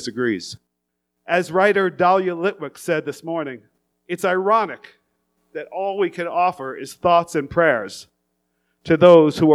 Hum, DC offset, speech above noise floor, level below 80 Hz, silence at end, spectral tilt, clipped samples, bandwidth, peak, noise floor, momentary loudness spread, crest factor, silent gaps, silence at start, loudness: none; under 0.1%; 59 dB; -58 dBFS; 0 s; -6 dB/octave; under 0.1%; 14 kHz; 0 dBFS; -77 dBFS; 18 LU; 20 dB; none; 0 s; -19 LUFS